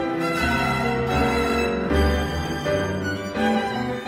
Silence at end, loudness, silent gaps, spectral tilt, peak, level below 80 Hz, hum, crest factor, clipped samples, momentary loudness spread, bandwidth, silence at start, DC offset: 0 s; -23 LUFS; none; -5.5 dB/octave; -8 dBFS; -32 dBFS; none; 16 dB; under 0.1%; 5 LU; 16 kHz; 0 s; under 0.1%